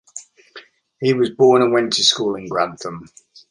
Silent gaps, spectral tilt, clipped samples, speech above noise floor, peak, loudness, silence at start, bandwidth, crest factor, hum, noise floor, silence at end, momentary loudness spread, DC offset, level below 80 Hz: none; -3.5 dB/octave; under 0.1%; 27 dB; -2 dBFS; -17 LUFS; 0.15 s; 11 kHz; 18 dB; none; -44 dBFS; 0.45 s; 21 LU; under 0.1%; -62 dBFS